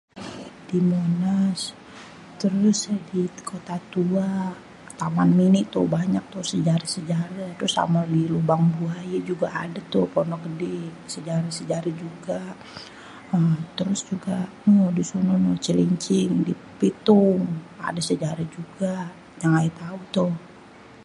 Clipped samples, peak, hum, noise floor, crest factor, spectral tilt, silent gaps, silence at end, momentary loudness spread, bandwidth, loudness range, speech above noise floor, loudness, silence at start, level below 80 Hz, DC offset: under 0.1%; -4 dBFS; none; -46 dBFS; 20 dB; -6.5 dB/octave; none; 0 s; 15 LU; 11.5 kHz; 5 LU; 24 dB; -24 LUFS; 0.15 s; -60 dBFS; under 0.1%